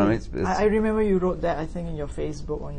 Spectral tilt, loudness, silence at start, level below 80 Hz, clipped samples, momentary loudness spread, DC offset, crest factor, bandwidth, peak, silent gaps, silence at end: -7.5 dB/octave; -25 LUFS; 0 s; -36 dBFS; under 0.1%; 10 LU; under 0.1%; 16 dB; 9.8 kHz; -8 dBFS; none; 0 s